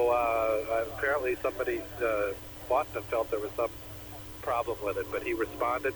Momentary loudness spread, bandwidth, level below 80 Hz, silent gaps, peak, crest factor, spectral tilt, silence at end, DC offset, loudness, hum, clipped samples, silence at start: 8 LU; over 20 kHz; -52 dBFS; none; -14 dBFS; 16 dB; -5 dB/octave; 0 s; under 0.1%; -31 LUFS; 60 Hz at -55 dBFS; under 0.1%; 0 s